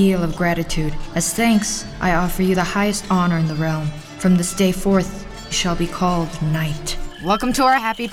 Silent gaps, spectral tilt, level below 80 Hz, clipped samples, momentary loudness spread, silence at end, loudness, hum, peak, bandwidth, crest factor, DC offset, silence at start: none; -5 dB/octave; -32 dBFS; under 0.1%; 8 LU; 0 s; -19 LUFS; none; -4 dBFS; 16 kHz; 16 dB; under 0.1%; 0 s